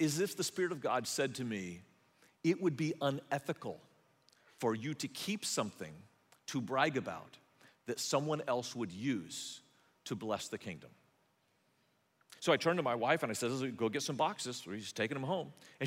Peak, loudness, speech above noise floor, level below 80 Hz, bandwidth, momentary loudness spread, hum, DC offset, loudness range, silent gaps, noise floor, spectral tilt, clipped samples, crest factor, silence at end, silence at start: -16 dBFS; -37 LUFS; 39 dB; -82 dBFS; 16 kHz; 14 LU; none; under 0.1%; 5 LU; none; -75 dBFS; -4 dB/octave; under 0.1%; 22 dB; 0 s; 0 s